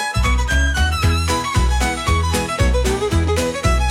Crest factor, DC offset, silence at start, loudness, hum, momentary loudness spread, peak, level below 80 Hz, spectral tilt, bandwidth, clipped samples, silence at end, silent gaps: 14 dB; under 0.1%; 0 s; -18 LUFS; none; 1 LU; -2 dBFS; -20 dBFS; -4.5 dB/octave; 16 kHz; under 0.1%; 0 s; none